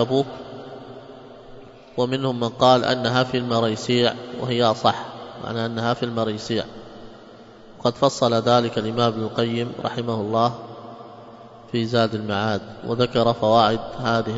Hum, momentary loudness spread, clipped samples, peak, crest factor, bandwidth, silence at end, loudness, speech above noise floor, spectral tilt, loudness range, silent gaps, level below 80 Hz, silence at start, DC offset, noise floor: none; 21 LU; under 0.1%; 0 dBFS; 22 dB; 8 kHz; 0 s; -22 LUFS; 23 dB; -6 dB/octave; 4 LU; none; -54 dBFS; 0 s; under 0.1%; -44 dBFS